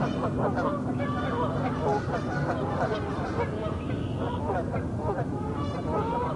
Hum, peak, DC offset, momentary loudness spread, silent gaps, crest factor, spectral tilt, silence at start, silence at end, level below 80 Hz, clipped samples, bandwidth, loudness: none; -14 dBFS; under 0.1%; 4 LU; none; 14 dB; -8 dB/octave; 0 s; 0 s; -46 dBFS; under 0.1%; 11 kHz; -29 LUFS